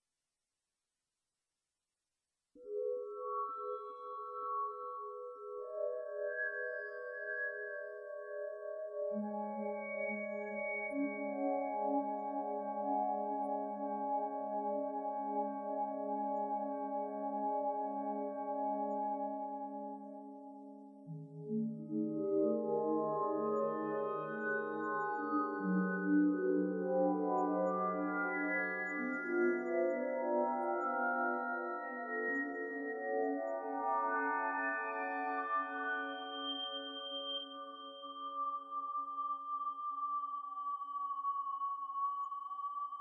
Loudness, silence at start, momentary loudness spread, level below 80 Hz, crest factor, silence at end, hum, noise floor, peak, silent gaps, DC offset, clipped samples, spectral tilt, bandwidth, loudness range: -38 LUFS; 2.55 s; 10 LU; under -90 dBFS; 16 dB; 0 s; none; under -90 dBFS; -22 dBFS; none; under 0.1%; under 0.1%; -7.5 dB/octave; 7.2 kHz; 7 LU